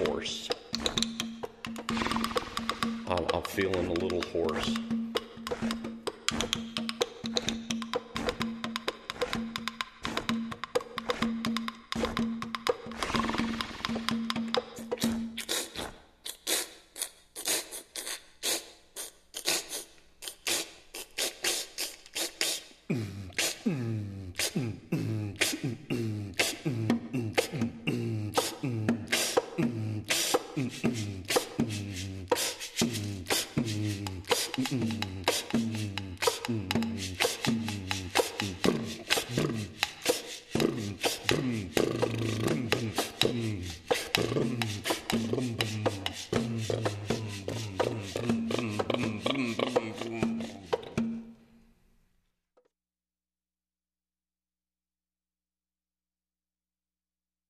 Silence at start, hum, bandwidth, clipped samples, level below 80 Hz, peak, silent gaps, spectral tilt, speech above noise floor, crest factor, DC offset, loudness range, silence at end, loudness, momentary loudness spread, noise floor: 0 s; 60 Hz at -65 dBFS; 14 kHz; under 0.1%; -56 dBFS; -6 dBFS; none; -3.5 dB/octave; over 59 dB; 28 dB; under 0.1%; 4 LU; 6.15 s; -32 LUFS; 8 LU; under -90 dBFS